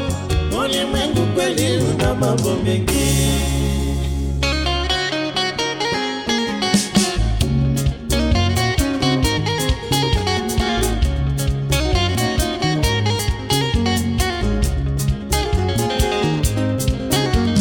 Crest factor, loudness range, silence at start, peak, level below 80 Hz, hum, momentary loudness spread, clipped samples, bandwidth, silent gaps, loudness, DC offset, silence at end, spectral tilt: 16 dB; 1 LU; 0 s; -2 dBFS; -24 dBFS; none; 3 LU; under 0.1%; 17.5 kHz; none; -19 LUFS; under 0.1%; 0 s; -4.5 dB/octave